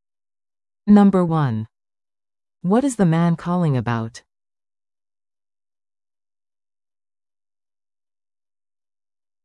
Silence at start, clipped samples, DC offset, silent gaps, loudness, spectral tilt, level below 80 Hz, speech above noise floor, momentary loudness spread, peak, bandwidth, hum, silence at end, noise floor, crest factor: 0.85 s; under 0.1%; under 0.1%; none; -18 LUFS; -8 dB/octave; -56 dBFS; over 73 dB; 16 LU; -4 dBFS; 11.5 kHz; none; 5.25 s; under -90 dBFS; 20 dB